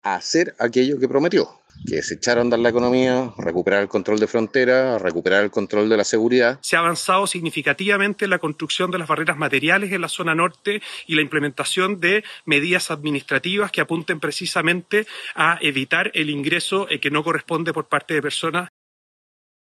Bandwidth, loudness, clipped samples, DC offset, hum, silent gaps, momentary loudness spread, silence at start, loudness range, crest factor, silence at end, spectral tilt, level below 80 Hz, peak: 13 kHz; -20 LUFS; under 0.1%; under 0.1%; none; none; 6 LU; 0.05 s; 2 LU; 16 dB; 1 s; -4 dB/octave; -64 dBFS; -4 dBFS